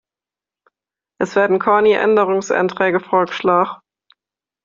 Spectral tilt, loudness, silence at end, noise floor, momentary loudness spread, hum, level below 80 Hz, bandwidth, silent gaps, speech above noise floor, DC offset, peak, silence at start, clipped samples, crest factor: -3.5 dB/octave; -16 LUFS; 0.9 s; -90 dBFS; 7 LU; none; -62 dBFS; 7.6 kHz; none; 74 dB; under 0.1%; -2 dBFS; 1.2 s; under 0.1%; 16 dB